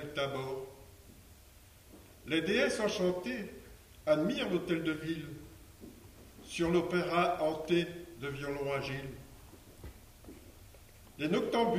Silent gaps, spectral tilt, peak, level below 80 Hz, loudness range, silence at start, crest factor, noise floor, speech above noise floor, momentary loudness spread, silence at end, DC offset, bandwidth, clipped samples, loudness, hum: none; -5.5 dB/octave; -16 dBFS; -58 dBFS; 5 LU; 0 s; 20 dB; -58 dBFS; 25 dB; 24 LU; 0 s; under 0.1%; 15.5 kHz; under 0.1%; -34 LUFS; none